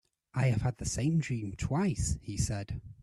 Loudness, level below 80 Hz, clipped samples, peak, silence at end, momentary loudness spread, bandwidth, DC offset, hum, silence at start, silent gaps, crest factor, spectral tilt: -33 LUFS; -46 dBFS; under 0.1%; -16 dBFS; 0.1 s; 7 LU; 12.5 kHz; under 0.1%; none; 0.35 s; none; 16 dB; -5.5 dB/octave